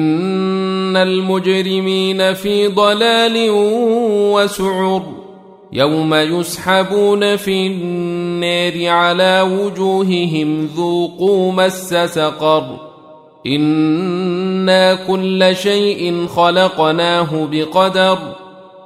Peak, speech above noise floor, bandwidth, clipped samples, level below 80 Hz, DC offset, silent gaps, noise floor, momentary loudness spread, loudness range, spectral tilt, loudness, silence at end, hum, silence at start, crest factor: 0 dBFS; 27 dB; 16 kHz; under 0.1%; -56 dBFS; under 0.1%; none; -41 dBFS; 6 LU; 2 LU; -5 dB/octave; -14 LUFS; 0.05 s; none; 0 s; 14 dB